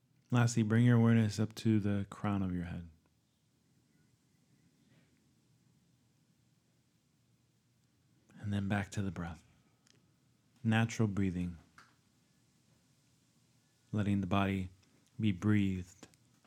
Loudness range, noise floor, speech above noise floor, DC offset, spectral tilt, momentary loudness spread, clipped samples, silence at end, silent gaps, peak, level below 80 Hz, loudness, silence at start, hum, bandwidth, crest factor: 11 LU; -74 dBFS; 42 dB; under 0.1%; -7 dB/octave; 15 LU; under 0.1%; 0.4 s; none; -16 dBFS; -66 dBFS; -34 LUFS; 0.3 s; none; 11 kHz; 22 dB